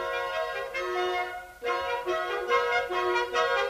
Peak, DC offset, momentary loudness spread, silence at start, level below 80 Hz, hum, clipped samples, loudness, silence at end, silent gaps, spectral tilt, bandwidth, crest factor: -12 dBFS; under 0.1%; 6 LU; 0 s; -60 dBFS; none; under 0.1%; -29 LUFS; 0 s; none; -2.5 dB/octave; 15.5 kHz; 16 dB